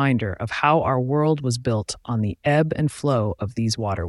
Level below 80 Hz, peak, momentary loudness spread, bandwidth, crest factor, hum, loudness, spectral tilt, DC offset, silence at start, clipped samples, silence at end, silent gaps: -46 dBFS; -4 dBFS; 7 LU; 12 kHz; 18 dB; none; -22 LUFS; -6 dB/octave; under 0.1%; 0 s; under 0.1%; 0 s; none